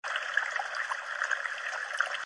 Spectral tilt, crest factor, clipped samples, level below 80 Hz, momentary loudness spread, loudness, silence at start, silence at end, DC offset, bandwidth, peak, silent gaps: 3 dB/octave; 22 dB; under 0.1%; -88 dBFS; 4 LU; -32 LUFS; 0.05 s; 0 s; under 0.1%; 11.5 kHz; -12 dBFS; none